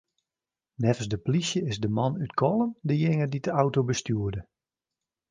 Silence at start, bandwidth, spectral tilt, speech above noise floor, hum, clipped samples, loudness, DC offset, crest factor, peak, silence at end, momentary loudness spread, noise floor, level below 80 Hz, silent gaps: 0.8 s; 9.8 kHz; -6 dB/octave; over 64 dB; none; under 0.1%; -27 LUFS; under 0.1%; 20 dB; -8 dBFS; 0.9 s; 4 LU; under -90 dBFS; -54 dBFS; none